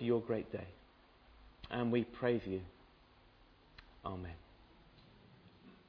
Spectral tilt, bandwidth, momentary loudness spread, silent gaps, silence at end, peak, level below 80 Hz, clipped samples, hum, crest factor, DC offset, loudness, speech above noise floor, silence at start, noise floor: -6 dB/octave; 5.4 kHz; 27 LU; none; 0.15 s; -20 dBFS; -64 dBFS; under 0.1%; none; 22 dB; under 0.1%; -39 LUFS; 27 dB; 0 s; -65 dBFS